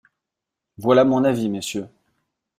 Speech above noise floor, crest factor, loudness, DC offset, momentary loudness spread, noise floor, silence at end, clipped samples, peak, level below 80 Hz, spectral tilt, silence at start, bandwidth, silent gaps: 66 dB; 18 dB; -19 LUFS; under 0.1%; 13 LU; -84 dBFS; 0.7 s; under 0.1%; -4 dBFS; -62 dBFS; -6 dB/octave; 0.8 s; 15 kHz; none